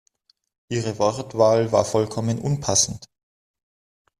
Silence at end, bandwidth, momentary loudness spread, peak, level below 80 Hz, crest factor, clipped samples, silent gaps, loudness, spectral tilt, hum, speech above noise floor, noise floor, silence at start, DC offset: 1.15 s; 14 kHz; 9 LU; -4 dBFS; -56 dBFS; 20 dB; under 0.1%; none; -21 LUFS; -4.5 dB/octave; none; 44 dB; -65 dBFS; 0.7 s; under 0.1%